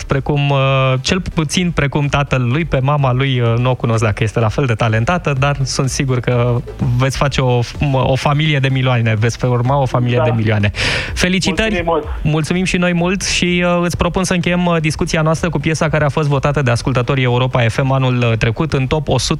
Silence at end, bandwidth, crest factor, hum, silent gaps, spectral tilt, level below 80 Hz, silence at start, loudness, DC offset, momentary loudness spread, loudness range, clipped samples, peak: 0 s; 12 kHz; 14 dB; none; none; -5.5 dB/octave; -30 dBFS; 0 s; -15 LUFS; under 0.1%; 3 LU; 1 LU; under 0.1%; 0 dBFS